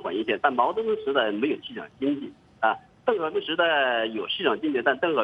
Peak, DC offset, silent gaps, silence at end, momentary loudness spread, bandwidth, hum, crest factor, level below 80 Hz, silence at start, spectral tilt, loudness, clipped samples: -6 dBFS; under 0.1%; none; 0 s; 7 LU; 5.4 kHz; none; 20 dB; -68 dBFS; 0 s; -6.5 dB/octave; -25 LUFS; under 0.1%